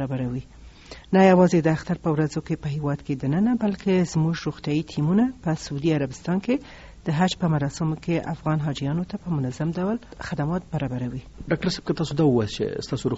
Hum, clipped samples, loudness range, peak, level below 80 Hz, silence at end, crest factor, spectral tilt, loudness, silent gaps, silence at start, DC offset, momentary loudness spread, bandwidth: none; under 0.1%; 5 LU; -6 dBFS; -48 dBFS; 0 s; 18 dB; -6.5 dB/octave; -24 LUFS; none; 0 s; under 0.1%; 8 LU; 8 kHz